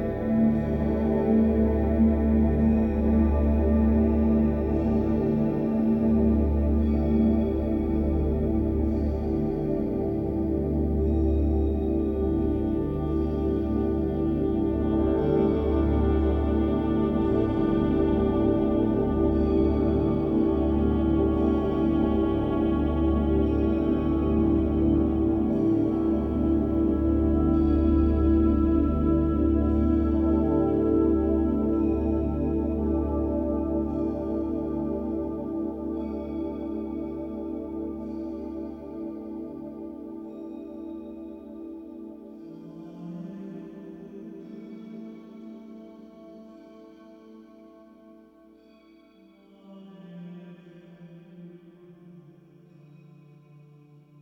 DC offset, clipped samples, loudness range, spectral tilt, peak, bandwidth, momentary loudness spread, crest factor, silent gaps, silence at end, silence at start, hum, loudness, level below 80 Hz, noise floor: under 0.1%; under 0.1%; 17 LU; -11 dB/octave; -10 dBFS; 4.5 kHz; 18 LU; 14 dB; none; 2 s; 0 s; none; -25 LUFS; -32 dBFS; -55 dBFS